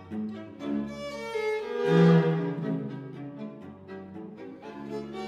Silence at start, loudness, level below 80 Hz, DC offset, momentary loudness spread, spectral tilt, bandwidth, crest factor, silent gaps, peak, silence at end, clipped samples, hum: 0 s; -28 LUFS; -66 dBFS; under 0.1%; 21 LU; -8 dB/octave; 8.6 kHz; 18 dB; none; -10 dBFS; 0 s; under 0.1%; none